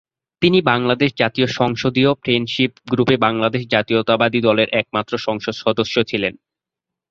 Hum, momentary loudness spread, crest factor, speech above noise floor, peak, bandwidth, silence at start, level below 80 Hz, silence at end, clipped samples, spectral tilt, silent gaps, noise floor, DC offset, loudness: none; 6 LU; 16 dB; 67 dB; -2 dBFS; 7.6 kHz; 0.4 s; -54 dBFS; 0.8 s; under 0.1%; -6 dB/octave; none; -85 dBFS; under 0.1%; -18 LUFS